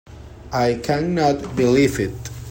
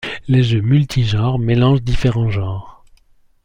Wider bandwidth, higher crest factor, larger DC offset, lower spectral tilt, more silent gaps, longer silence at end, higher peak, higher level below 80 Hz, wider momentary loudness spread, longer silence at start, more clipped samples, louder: first, 16.5 kHz vs 9.6 kHz; about the same, 16 dB vs 14 dB; neither; second, -6 dB/octave vs -7.5 dB/octave; neither; second, 0 s vs 0.75 s; about the same, -4 dBFS vs -2 dBFS; second, -42 dBFS vs -32 dBFS; first, 11 LU vs 7 LU; about the same, 0.1 s vs 0 s; neither; second, -20 LUFS vs -16 LUFS